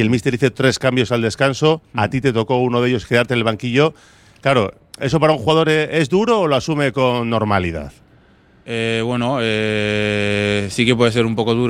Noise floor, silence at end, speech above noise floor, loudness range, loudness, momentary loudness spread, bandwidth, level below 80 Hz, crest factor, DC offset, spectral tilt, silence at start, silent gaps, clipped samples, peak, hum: -50 dBFS; 0 s; 34 dB; 3 LU; -17 LUFS; 5 LU; 14.5 kHz; -46 dBFS; 16 dB; under 0.1%; -5.5 dB/octave; 0 s; none; under 0.1%; 0 dBFS; none